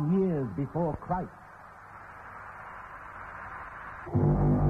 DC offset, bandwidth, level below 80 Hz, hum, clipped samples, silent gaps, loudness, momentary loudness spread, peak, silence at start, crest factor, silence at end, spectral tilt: under 0.1%; 3.2 kHz; -42 dBFS; none; under 0.1%; none; -31 LUFS; 20 LU; -14 dBFS; 0 s; 18 dB; 0 s; -11 dB/octave